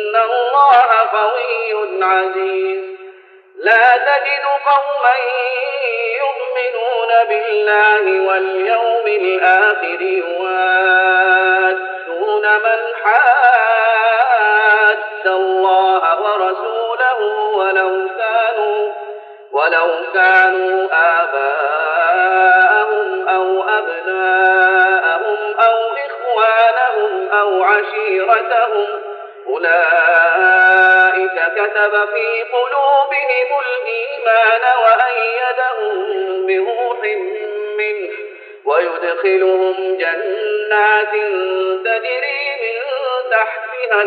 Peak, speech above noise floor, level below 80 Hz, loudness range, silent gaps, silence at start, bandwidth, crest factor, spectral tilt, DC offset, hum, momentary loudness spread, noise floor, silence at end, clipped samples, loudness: 0 dBFS; 27 dB; -78 dBFS; 5 LU; none; 0 s; 5 kHz; 14 dB; -3 dB/octave; under 0.1%; none; 9 LU; -41 dBFS; 0 s; under 0.1%; -14 LUFS